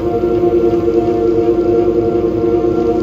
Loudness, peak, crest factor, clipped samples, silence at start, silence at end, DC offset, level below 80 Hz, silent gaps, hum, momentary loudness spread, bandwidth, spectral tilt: -13 LUFS; 0 dBFS; 12 dB; under 0.1%; 0 s; 0 s; under 0.1%; -34 dBFS; none; none; 2 LU; 6.8 kHz; -9 dB/octave